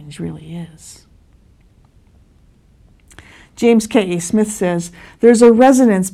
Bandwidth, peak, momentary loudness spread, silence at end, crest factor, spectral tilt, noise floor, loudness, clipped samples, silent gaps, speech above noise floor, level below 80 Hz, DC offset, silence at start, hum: 14.5 kHz; 0 dBFS; 23 LU; 0.05 s; 16 dB; -5.5 dB/octave; -50 dBFS; -13 LUFS; under 0.1%; none; 37 dB; -50 dBFS; under 0.1%; 0 s; none